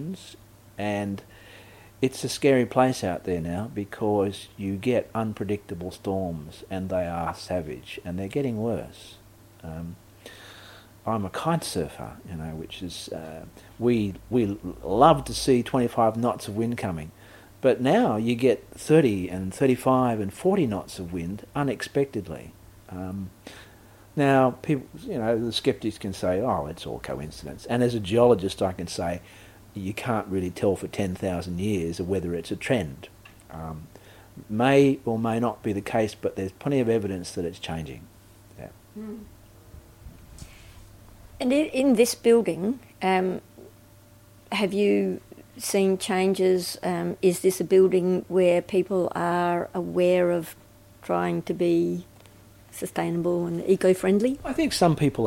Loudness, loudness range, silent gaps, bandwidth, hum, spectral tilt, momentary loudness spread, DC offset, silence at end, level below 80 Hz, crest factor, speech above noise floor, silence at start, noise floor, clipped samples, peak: -25 LUFS; 9 LU; none; 16.5 kHz; none; -6 dB/octave; 18 LU; under 0.1%; 0 s; -52 dBFS; 22 dB; 27 dB; 0 s; -52 dBFS; under 0.1%; -4 dBFS